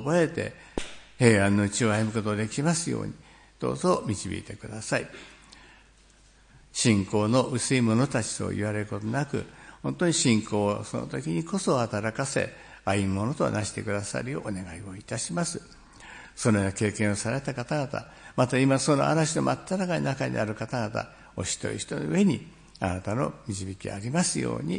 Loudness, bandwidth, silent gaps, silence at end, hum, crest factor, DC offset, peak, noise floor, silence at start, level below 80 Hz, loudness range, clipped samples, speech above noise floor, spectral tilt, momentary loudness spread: -27 LUFS; 10.5 kHz; none; 0 s; none; 24 dB; under 0.1%; -4 dBFS; -57 dBFS; 0 s; -56 dBFS; 5 LU; under 0.1%; 30 dB; -5 dB/octave; 13 LU